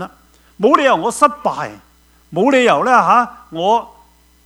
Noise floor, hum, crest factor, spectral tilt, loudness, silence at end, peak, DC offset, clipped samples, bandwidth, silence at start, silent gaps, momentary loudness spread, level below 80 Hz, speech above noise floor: -49 dBFS; none; 16 dB; -4.5 dB/octave; -14 LUFS; 0.6 s; 0 dBFS; under 0.1%; under 0.1%; over 20 kHz; 0 s; none; 14 LU; -54 dBFS; 36 dB